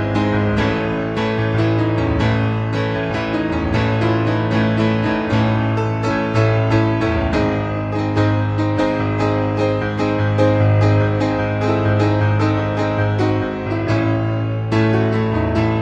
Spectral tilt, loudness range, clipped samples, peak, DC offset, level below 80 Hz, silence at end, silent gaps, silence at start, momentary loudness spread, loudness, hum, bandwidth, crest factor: -8 dB/octave; 2 LU; under 0.1%; -2 dBFS; under 0.1%; -36 dBFS; 0 s; none; 0 s; 4 LU; -18 LUFS; none; 7.6 kHz; 14 dB